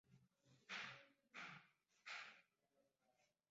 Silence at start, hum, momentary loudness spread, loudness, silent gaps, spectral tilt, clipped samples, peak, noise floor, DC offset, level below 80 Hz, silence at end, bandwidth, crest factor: 0.1 s; none; 11 LU; -56 LUFS; none; 0 dB/octave; under 0.1%; -38 dBFS; -86 dBFS; under 0.1%; under -90 dBFS; 0.25 s; 7.6 kHz; 24 dB